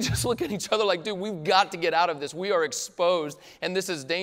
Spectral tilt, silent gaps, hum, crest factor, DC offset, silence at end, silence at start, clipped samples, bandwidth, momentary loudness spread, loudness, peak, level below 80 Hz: -3.5 dB/octave; none; none; 18 dB; under 0.1%; 0 s; 0 s; under 0.1%; 16 kHz; 8 LU; -26 LUFS; -8 dBFS; -52 dBFS